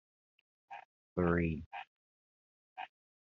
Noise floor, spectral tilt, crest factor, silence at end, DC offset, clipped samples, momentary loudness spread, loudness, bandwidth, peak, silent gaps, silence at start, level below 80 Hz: under -90 dBFS; -7 dB/octave; 22 dB; 0.35 s; under 0.1%; under 0.1%; 21 LU; -35 LUFS; 4 kHz; -18 dBFS; 0.85-1.16 s, 1.66-1.71 s, 1.87-2.76 s; 0.7 s; -62 dBFS